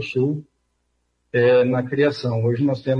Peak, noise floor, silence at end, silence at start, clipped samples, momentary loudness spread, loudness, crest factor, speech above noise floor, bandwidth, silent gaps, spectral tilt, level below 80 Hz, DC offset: -6 dBFS; -70 dBFS; 0 s; 0 s; under 0.1%; 8 LU; -20 LUFS; 14 dB; 51 dB; 7 kHz; none; -8 dB/octave; -62 dBFS; under 0.1%